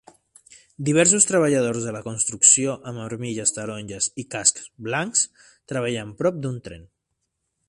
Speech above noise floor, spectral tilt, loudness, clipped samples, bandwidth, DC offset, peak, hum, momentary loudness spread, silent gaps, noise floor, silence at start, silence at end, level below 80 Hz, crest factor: 55 dB; -3 dB/octave; -21 LUFS; under 0.1%; 11.5 kHz; under 0.1%; 0 dBFS; none; 16 LU; none; -77 dBFS; 0.8 s; 0.85 s; -60 dBFS; 24 dB